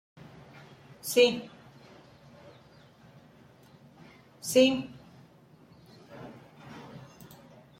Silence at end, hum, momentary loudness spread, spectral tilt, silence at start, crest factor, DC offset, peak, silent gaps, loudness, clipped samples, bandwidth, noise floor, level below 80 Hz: 0.8 s; none; 29 LU; -3.5 dB/octave; 1.05 s; 24 dB; under 0.1%; -10 dBFS; none; -26 LUFS; under 0.1%; 16.5 kHz; -57 dBFS; -70 dBFS